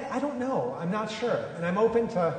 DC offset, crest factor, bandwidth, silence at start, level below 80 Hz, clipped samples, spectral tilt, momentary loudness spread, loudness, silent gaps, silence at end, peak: under 0.1%; 14 dB; 9.4 kHz; 0 s; -62 dBFS; under 0.1%; -6.5 dB/octave; 6 LU; -28 LUFS; none; 0 s; -12 dBFS